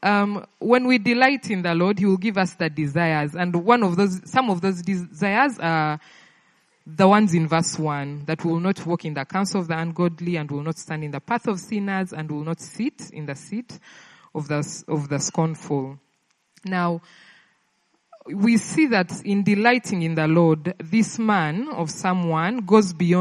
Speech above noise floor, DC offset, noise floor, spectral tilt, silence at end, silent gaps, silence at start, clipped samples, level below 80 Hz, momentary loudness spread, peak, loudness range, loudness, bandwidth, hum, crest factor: 46 dB; under 0.1%; -68 dBFS; -6 dB/octave; 0 s; none; 0 s; under 0.1%; -66 dBFS; 12 LU; 0 dBFS; 8 LU; -22 LUFS; 11.5 kHz; none; 22 dB